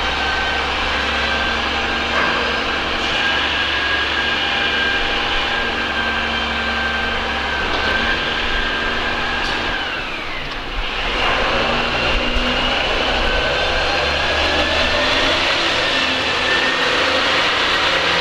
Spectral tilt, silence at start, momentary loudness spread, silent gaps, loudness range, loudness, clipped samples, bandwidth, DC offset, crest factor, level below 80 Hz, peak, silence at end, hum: -3 dB/octave; 0 s; 4 LU; none; 4 LU; -17 LUFS; under 0.1%; 15 kHz; under 0.1%; 14 dB; -30 dBFS; -4 dBFS; 0 s; none